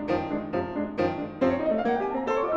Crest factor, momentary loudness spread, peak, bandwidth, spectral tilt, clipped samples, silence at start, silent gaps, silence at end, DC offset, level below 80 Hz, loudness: 16 dB; 4 LU; -12 dBFS; 7.6 kHz; -7.5 dB/octave; under 0.1%; 0 s; none; 0 s; under 0.1%; -54 dBFS; -27 LUFS